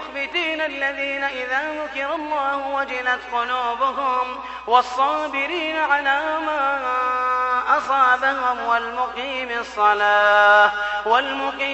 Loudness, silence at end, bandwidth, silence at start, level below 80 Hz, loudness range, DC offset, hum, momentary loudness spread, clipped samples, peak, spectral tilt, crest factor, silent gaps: -20 LUFS; 0 s; 8.4 kHz; 0 s; -56 dBFS; 5 LU; under 0.1%; none; 9 LU; under 0.1%; -2 dBFS; -2.5 dB/octave; 18 dB; none